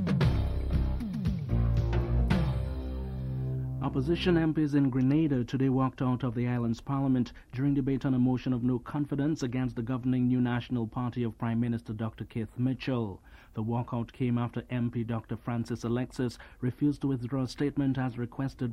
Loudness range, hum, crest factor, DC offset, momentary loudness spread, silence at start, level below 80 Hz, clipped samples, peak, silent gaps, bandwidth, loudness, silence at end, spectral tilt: 5 LU; none; 16 dB; under 0.1%; 9 LU; 0 s; -40 dBFS; under 0.1%; -14 dBFS; none; 10.5 kHz; -31 LUFS; 0 s; -8.5 dB/octave